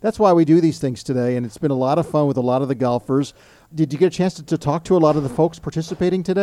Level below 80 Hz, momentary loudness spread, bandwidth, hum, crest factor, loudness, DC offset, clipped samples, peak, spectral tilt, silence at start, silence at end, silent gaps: -50 dBFS; 8 LU; 12 kHz; none; 16 dB; -19 LUFS; under 0.1%; under 0.1%; -2 dBFS; -7.5 dB/octave; 0.05 s; 0 s; none